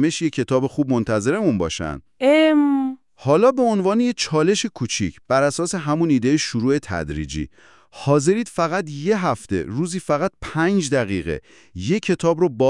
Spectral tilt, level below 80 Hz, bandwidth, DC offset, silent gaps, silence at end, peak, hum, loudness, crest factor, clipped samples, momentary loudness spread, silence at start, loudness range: -5.5 dB/octave; -48 dBFS; 12 kHz; 0.2%; none; 0 s; -4 dBFS; none; -20 LUFS; 16 dB; under 0.1%; 11 LU; 0 s; 4 LU